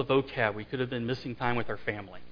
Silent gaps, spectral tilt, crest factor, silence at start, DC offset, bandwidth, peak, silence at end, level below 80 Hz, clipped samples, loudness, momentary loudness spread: none; -7.5 dB/octave; 20 dB; 0 s; under 0.1%; 5.2 kHz; -10 dBFS; 0 s; -56 dBFS; under 0.1%; -32 LUFS; 7 LU